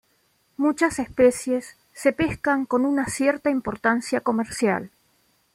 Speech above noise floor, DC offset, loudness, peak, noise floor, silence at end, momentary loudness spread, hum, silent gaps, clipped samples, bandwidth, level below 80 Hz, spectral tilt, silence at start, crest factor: 43 dB; under 0.1%; -23 LUFS; -6 dBFS; -66 dBFS; 0.7 s; 8 LU; none; none; under 0.1%; 15.5 kHz; -54 dBFS; -5 dB/octave; 0.6 s; 18 dB